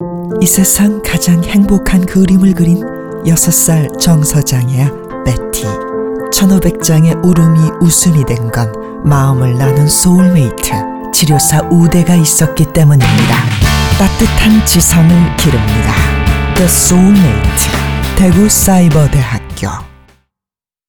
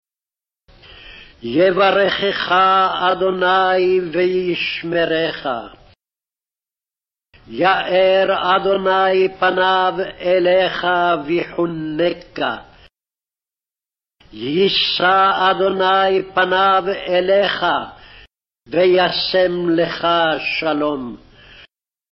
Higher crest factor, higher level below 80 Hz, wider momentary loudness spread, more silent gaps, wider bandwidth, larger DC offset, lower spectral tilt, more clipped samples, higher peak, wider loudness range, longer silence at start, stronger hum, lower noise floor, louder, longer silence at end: about the same, 10 dB vs 14 dB; first, -22 dBFS vs -52 dBFS; about the same, 9 LU vs 9 LU; neither; first, over 20 kHz vs 6 kHz; first, 0.8% vs under 0.1%; second, -5 dB/octave vs -6.5 dB/octave; neither; first, 0 dBFS vs -4 dBFS; second, 3 LU vs 6 LU; second, 0 s vs 0.9 s; neither; about the same, -89 dBFS vs under -90 dBFS; first, -9 LUFS vs -16 LUFS; about the same, 1 s vs 0.95 s